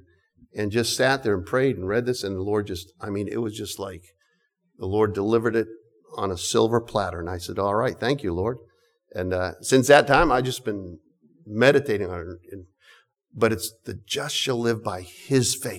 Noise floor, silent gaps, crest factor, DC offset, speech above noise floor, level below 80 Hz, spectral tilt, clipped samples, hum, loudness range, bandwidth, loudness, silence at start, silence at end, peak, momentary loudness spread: -70 dBFS; none; 20 dB; under 0.1%; 47 dB; -48 dBFS; -4.5 dB/octave; under 0.1%; none; 6 LU; 19 kHz; -24 LUFS; 0.55 s; 0 s; -4 dBFS; 16 LU